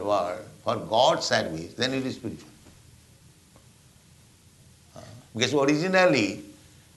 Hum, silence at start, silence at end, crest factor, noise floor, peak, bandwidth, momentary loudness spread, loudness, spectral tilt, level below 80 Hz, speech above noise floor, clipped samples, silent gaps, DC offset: none; 0 s; 0.45 s; 22 dB; -55 dBFS; -6 dBFS; 12 kHz; 19 LU; -25 LUFS; -4 dB/octave; -62 dBFS; 31 dB; under 0.1%; none; under 0.1%